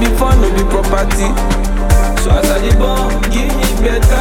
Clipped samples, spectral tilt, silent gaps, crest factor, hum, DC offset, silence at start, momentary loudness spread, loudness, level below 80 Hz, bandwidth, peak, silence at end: under 0.1%; -5.5 dB/octave; none; 10 dB; none; under 0.1%; 0 s; 4 LU; -14 LUFS; -12 dBFS; 16.5 kHz; 0 dBFS; 0 s